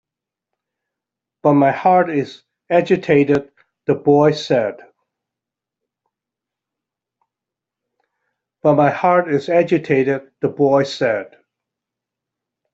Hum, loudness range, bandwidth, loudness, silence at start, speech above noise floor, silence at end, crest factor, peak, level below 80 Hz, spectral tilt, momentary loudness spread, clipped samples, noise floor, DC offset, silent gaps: none; 6 LU; 7.8 kHz; -16 LUFS; 1.45 s; 70 dB; 1.45 s; 16 dB; -2 dBFS; -62 dBFS; -7 dB/octave; 8 LU; under 0.1%; -86 dBFS; under 0.1%; none